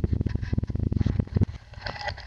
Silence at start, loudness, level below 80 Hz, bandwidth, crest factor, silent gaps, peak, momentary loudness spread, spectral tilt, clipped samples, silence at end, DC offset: 0 s; -29 LUFS; -34 dBFS; 7 kHz; 18 dB; none; -8 dBFS; 8 LU; -8 dB/octave; under 0.1%; 0 s; under 0.1%